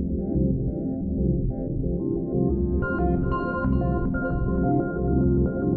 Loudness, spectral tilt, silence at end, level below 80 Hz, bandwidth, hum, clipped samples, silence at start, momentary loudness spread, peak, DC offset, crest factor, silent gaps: -25 LUFS; -13.5 dB/octave; 0 s; -30 dBFS; 4.5 kHz; none; under 0.1%; 0 s; 5 LU; -10 dBFS; under 0.1%; 14 dB; none